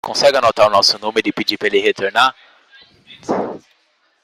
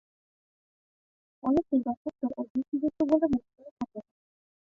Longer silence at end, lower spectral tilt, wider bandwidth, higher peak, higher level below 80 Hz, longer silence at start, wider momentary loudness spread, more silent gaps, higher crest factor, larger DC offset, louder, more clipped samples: about the same, 0.65 s vs 0.75 s; second, -2.5 dB/octave vs -9 dB/octave; first, 16 kHz vs 6.8 kHz; first, 0 dBFS vs -12 dBFS; about the same, -56 dBFS vs -60 dBFS; second, 0.05 s vs 1.45 s; about the same, 12 LU vs 13 LU; second, none vs 1.97-2.05 s, 2.50-2.55 s, 2.68-2.72 s, 3.71-3.77 s; about the same, 18 dB vs 20 dB; neither; first, -15 LUFS vs -30 LUFS; neither